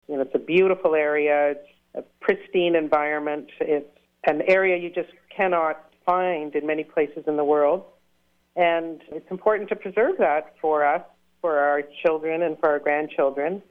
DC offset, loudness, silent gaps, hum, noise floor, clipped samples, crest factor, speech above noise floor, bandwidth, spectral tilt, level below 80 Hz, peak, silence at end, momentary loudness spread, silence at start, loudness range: under 0.1%; -23 LUFS; none; none; -67 dBFS; under 0.1%; 16 dB; 45 dB; 5.8 kHz; -7.5 dB/octave; -66 dBFS; -8 dBFS; 0.1 s; 9 LU; 0.1 s; 2 LU